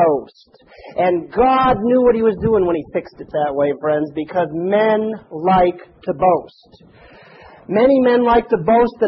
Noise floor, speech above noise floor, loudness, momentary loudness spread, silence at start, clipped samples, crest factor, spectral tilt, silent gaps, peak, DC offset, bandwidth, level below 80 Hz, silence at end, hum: -43 dBFS; 26 dB; -17 LUFS; 10 LU; 0 s; under 0.1%; 14 dB; -10 dB/octave; none; -2 dBFS; under 0.1%; 5.8 kHz; -44 dBFS; 0 s; none